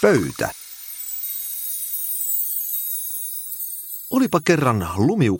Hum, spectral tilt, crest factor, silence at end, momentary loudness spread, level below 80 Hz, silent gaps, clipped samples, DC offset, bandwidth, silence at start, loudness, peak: none; -5 dB/octave; 20 dB; 0 s; 9 LU; -52 dBFS; none; under 0.1%; under 0.1%; 17 kHz; 0 s; -22 LUFS; -2 dBFS